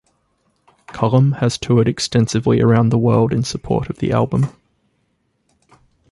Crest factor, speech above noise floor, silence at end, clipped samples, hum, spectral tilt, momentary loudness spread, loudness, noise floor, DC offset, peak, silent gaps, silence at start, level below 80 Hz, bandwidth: 16 dB; 50 dB; 1.6 s; under 0.1%; none; -6.5 dB/octave; 7 LU; -17 LUFS; -66 dBFS; under 0.1%; -2 dBFS; none; 0.9 s; -44 dBFS; 11.5 kHz